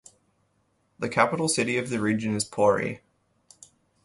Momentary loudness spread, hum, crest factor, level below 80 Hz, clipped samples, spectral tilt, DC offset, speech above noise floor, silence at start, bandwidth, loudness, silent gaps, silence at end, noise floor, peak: 10 LU; none; 22 dB; -62 dBFS; under 0.1%; -4.5 dB/octave; under 0.1%; 45 dB; 1 s; 11.5 kHz; -25 LUFS; none; 1.1 s; -70 dBFS; -6 dBFS